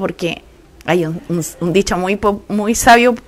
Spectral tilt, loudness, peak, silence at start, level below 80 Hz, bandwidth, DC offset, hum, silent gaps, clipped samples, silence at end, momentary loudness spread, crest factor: -4.5 dB/octave; -15 LUFS; 0 dBFS; 0 s; -38 dBFS; 16 kHz; under 0.1%; none; none; 0.2%; 0.1 s; 13 LU; 16 dB